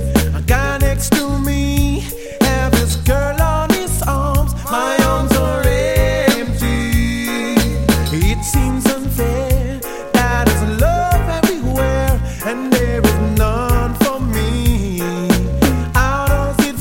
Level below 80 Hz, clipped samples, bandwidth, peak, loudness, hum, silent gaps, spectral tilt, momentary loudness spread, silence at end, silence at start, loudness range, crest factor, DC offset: -20 dBFS; under 0.1%; 17 kHz; 0 dBFS; -16 LUFS; none; none; -5.5 dB/octave; 4 LU; 0 s; 0 s; 1 LU; 14 dB; under 0.1%